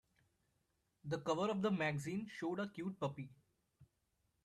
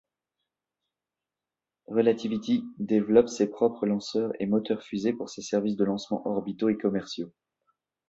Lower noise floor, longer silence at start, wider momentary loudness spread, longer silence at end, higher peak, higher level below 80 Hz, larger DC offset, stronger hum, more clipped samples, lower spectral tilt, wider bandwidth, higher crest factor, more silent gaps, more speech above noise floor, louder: second, -83 dBFS vs -90 dBFS; second, 1.05 s vs 1.9 s; first, 12 LU vs 9 LU; second, 0.6 s vs 0.8 s; second, -24 dBFS vs -6 dBFS; second, -78 dBFS vs -68 dBFS; neither; neither; neither; about the same, -6 dB/octave vs -6 dB/octave; first, 13 kHz vs 8 kHz; about the same, 20 dB vs 22 dB; neither; second, 43 dB vs 63 dB; second, -41 LUFS vs -27 LUFS